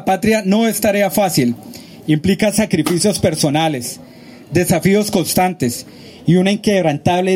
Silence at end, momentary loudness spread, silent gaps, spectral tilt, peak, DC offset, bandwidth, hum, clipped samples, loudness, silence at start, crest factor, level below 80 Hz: 0 s; 11 LU; none; -5 dB/octave; -2 dBFS; under 0.1%; 16.5 kHz; none; under 0.1%; -15 LUFS; 0 s; 14 dB; -46 dBFS